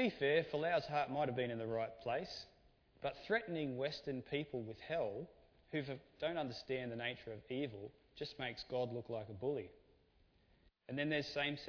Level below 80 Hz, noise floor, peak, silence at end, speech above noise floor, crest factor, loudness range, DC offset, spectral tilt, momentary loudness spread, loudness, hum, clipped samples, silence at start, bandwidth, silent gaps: -70 dBFS; -72 dBFS; -22 dBFS; 0 s; 31 dB; 20 dB; 5 LU; under 0.1%; -3.5 dB/octave; 11 LU; -42 LUFS; none; under 0.1%; 0 s; 5.4 kHz; none